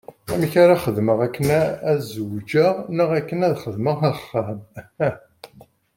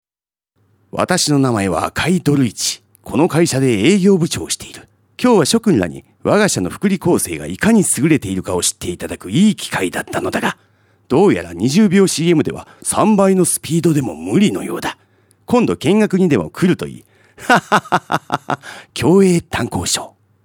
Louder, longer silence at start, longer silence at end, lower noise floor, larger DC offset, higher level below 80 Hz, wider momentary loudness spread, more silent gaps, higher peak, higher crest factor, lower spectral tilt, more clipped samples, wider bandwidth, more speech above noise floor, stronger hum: second, -21 LUFS vs -15 LUFS; second, 0.1 s vs 0.95 s; first, 0.5 s vs 0.35 s; second, -51 dBFS vs under -90 dBFS; neither; second, -54 dBFS vs -48 dBFS; about the same, 12 LU vs 11 LU; neither; about the same, -2 dBFS vs 0 dBFS; about the same, 18 dB vs 16 dB; first, -7 dB/octave vs -5 dB/octave; neither; about the same, 17 kHz vs 18 kHz; second, 31 dB vs over 75 dB; neither